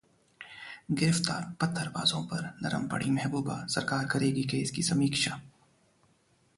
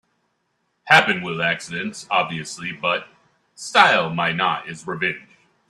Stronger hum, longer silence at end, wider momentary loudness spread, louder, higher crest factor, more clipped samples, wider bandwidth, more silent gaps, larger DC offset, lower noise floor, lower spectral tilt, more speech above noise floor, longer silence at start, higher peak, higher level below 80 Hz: neither; first, 1.1 s vs 0.5 s; about the same, 15 LU vs 14 LU; second, -30 LUFS vs -20 LUFS; about the same, 22 dB vs 22 dB; neither; second, 11.5 kHz vs 13.5 kHz; neither; neither; about the same, -68 dBFS vs -71 dBFS; about the same, -4.5 dB/octave vs -3.5 dB/octave; second, 38 dB vs 50 dB; second, 0.4 s vs 0.85 s; second, -10 dBFS vs 0 dBFS; about the same, -62 dBFS vs -64 dBFS